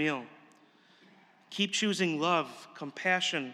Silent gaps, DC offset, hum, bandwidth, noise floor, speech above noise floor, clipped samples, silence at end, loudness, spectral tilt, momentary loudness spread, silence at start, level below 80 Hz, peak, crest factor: none; under 0.1%; none; 13.5 kHz; -62 dBFS; 31 dB; under 0.1%; 0 s; -30 LUFS; -3.5 dB/octave; 15 LU; 0 s; under -90 dBFS; -14 dBFS; 20 dB